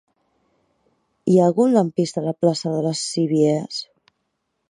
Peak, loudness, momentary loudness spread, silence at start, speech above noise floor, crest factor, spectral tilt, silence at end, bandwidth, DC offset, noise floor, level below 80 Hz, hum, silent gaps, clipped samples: -4 dBFS; -20 LUFS; 12 LU; 1.25 s; 55 dB; 18 dB; -6.5 dB/octave; 0.85 s; 11.5 kHz; under 0.1%; -74 dBFS; -70 dBFS; none; none; under 0.1%